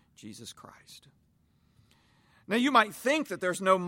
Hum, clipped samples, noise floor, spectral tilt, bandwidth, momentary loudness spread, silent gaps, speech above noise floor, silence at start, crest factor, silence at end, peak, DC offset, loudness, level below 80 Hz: none; under 0.1%; -68 dBFS; -4 dB/octave; 16.5 kHz; 24 LU; none; 39 dB; 0.25 s; 22 dB; 0 s; -8 dBFS; under 0.1%; -27 LUFS; -74 dBFS